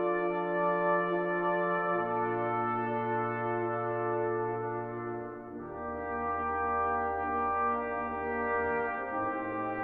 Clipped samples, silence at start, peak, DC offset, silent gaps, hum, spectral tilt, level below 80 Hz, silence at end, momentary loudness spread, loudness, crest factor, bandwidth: under 0.1%; 0 s; -18 dBFS; under 0.1%; none; none; -10 dB/octave; -58 dBFS; 0 s; 8 LU; -32 LUFS; 14 dB; 4.3 kHz